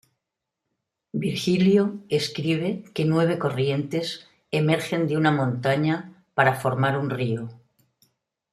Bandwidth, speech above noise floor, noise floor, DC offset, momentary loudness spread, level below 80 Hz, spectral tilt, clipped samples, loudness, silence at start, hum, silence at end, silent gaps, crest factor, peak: 14 kHz; 61 dB; -84 dBFS; under 0.1%; 9 LU; -64 dBFS; -6.5 dB/octave; under 0.1%; -24 LUFS; 1.15 s; none; 0.95 s; none; 22 dB; -4 dBFS